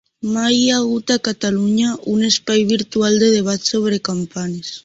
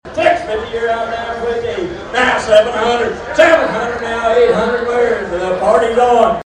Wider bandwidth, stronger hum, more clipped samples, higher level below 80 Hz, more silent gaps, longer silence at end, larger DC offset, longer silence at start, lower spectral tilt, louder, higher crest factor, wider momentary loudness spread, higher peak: second, 8 kHz vs 10 kHz; neither; neither; second, -56 dBFS vs -40 dBFS; neither; about the same, 0.05 s vs 0.05 s; neither; first, 0.25 s vs 0.05 s; about the same, -4 dB/octave vs -4 dB/octave; second, -17 LUFS vs -14 LUFS; about the same, 14 dB vs 14 dB; about the same, 9 LU vs 9 LU; about the same, -2 dBFS vs 0 dBFS